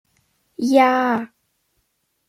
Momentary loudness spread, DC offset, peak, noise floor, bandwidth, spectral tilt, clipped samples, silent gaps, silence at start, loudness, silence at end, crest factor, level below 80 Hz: 22 LU; under 0.1%; -2 dBFS; -70 dBFS; 15.5 kHz; -4.5 dB/octave; under 0.1%; none; 0.6 s; -18 LUFS; 1 s; 18 dB; -70 dBFS